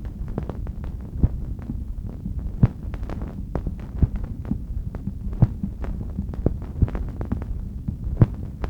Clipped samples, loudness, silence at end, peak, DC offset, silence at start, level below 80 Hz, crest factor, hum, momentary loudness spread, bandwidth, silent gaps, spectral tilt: under 0.1%; -28 LUFS; 0 s; -2 dBFS; under 0.1%; 0 s; -30 dBFS; 24 dB; none; 10 LU; 5.4 kHz; none; -10.5 dB/octave